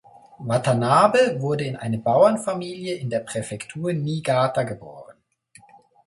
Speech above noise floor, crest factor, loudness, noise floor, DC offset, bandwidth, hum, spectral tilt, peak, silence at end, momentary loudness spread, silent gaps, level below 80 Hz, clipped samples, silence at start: 34 dB; 20 dB; -22 LUFS; -55 dBFS; under 0.1%; 11.5 kHz; none; -6 dB/octave; -2 dBFS; 0.95 s; 13 LU; none; -62 dBFS; under 0.1%; 0.4 s